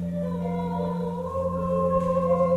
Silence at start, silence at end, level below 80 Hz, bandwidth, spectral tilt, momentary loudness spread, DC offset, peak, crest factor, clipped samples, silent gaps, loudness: 0 s; 0 s; -46 dBFS; 7.8 kHz; -9.5 dB/octave; 6 LU; under 0.1%; -12 dBFS; 14 dB; under 0.1%; none; -26 LUFS